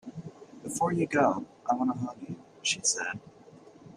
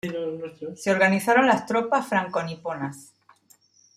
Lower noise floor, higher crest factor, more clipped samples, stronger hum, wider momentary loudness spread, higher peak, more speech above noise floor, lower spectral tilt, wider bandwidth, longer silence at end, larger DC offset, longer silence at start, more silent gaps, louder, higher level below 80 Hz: second, -53 dBFS vs -59 dBFS; about the same, 20 dB vs 20 dB; neither; neither; first, 18 LU vs 14 LU; second, -12 dBFS vs -4 dBFS; second, 24 dB vs 36 dB; second, -3.5 dB/octave vs -5 dB/octave; about the same, 15.5 kHz vs 15.5 kHz; second, 0 s vs 0.95 s; neither; about the same, 0.05 s vs 0.05 s; neither; second, -29 LUFS vs -23 LUFS; about the same, -70 dBFS vs -70 dBFS